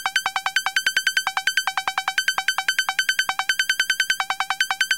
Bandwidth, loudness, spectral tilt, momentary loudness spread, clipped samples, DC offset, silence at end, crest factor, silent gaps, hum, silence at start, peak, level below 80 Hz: 17 kHz; -21 LUFS; 3 dB/octave; 3 LU; under 0.1%; 0.2%; 0 s; 16 dB; none; none; 0 s; -6 dBFS; -66 dBFS